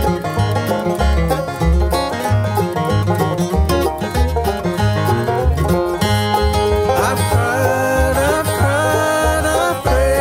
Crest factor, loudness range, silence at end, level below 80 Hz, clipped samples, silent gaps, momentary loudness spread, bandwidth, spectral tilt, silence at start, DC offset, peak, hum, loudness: 12 dB; 2 LU; 0 s; -22 dBFS; under 0.1%; none; 3 LU; 16.5 kHz; -5.5 dB/octave; 0 s; under 0.1%; -2 dBFS; none; -16 LUFS